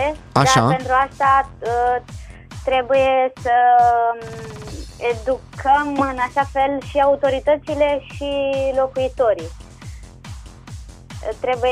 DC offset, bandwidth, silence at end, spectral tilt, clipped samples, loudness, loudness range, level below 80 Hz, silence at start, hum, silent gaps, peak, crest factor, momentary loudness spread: under 0.1%; 14.5 kHz; 0 s; -5 dB/octave; under 0.1%; -18 LUFS; 5 LU; -40 dBFS; 0 s; none; none; -2 dBFS; 18 dB; 23 LU